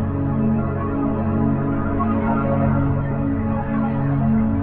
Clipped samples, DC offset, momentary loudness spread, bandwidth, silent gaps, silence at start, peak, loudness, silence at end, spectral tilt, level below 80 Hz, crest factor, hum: under 0.1%; under 0.1%; 3 LU; 3.5 kHz; none; 0 s; -8 dBFS; -21 LUFS; 0 s; -10.5 dB/octave; -34 dBFS; 12 dB; none